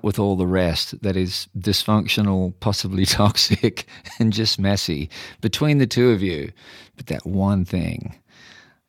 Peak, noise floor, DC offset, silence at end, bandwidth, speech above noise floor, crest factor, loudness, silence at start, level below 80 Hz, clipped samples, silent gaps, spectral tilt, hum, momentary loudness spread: -2 dBFS; -49 dBFS; under 0.1%; 0.75 s; 17 kHz; 28 dB; 20 dB; -20 LUFS; 0.05 s; -44 dBFS; under 0.1%; none; -5 dB/octave; none; 13 LU